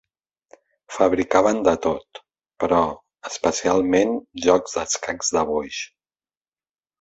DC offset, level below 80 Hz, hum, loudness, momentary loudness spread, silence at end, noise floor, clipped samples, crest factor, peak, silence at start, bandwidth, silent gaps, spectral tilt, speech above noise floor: under 0.1%; -52 dBFS; none; -21 LUFS; 13 LU; 1.15 s; under -90 dBFS; under 0.1%; 20 dB; -2 dBFS; 0.9 s; 8.2 kHz; none; -3.5 dB/octave; over 69 dB